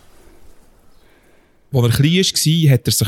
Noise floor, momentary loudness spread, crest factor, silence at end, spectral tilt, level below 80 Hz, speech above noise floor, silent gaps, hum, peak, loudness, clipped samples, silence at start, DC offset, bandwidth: -51 dBFS; 4 LU; 14 dB; 0 s; -4.5 dB/octave; -46 dBFS; 37 dB; none; none; -4 dBFS; -15 LUFS; under 0.1%; 1.7 s; under 0.1%; 17.5 kHz